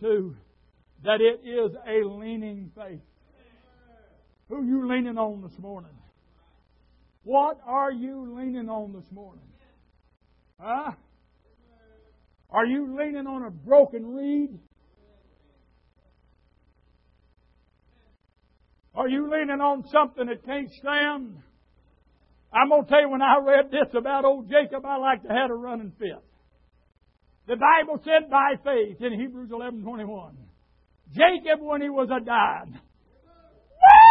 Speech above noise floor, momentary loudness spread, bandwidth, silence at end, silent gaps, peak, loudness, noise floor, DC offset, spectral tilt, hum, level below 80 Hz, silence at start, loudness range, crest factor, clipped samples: 41 dB; 19 LU; 5.2 kHz; 0 s; none; 0 dBFS; -23 LUFS; -64 dBFS; under 0.1%; -7.5 dB/octave; none; -60 dBFS; 0 s; 12 LU; 24 dB; under 0.1%